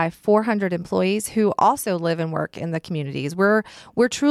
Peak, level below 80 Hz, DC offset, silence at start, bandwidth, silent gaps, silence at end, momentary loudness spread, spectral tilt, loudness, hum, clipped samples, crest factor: -6 dBFS; -60 dBFS; under 0.1%; 0 s; 14.5 kHz; none; 0 s; 8 LU; -5.5 dB/octave; -22 LUFS; none; under 0.1%; 14 dB